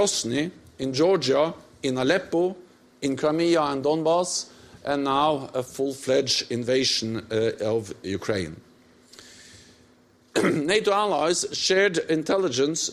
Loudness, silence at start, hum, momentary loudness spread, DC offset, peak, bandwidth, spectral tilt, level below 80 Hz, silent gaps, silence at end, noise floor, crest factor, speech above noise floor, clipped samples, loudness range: -24 LUFS; 0 s; none; 8 LU; under 0.1%; -8 dBFS; 14 kHz; -3.5 dB/octave; -62 dBFS; none; 0 s; -58 dBFS; 16 dB; 34 dB; under 0.1%; 5 LU